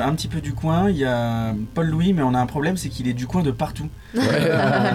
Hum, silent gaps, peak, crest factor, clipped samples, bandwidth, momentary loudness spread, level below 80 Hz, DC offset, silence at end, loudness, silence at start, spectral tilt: none; none; -10 dBFS; 12 dB; under 0.1%; 15.5 kHz; 8 LU; -40 dBFS; under 0.1%; 0 s; -22 LUFS; 0 s; -6.5 dB/octave